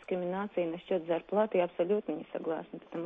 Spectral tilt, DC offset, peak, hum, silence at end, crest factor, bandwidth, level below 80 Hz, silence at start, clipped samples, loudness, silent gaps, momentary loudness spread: -9 dB/octave; under 0.1%; -16 dBFS; none; 0 s; 16 dB; 3.8 kHz; -74 dBFS; 0 s; under 0.1%; -33 LUFS; none; 8 LU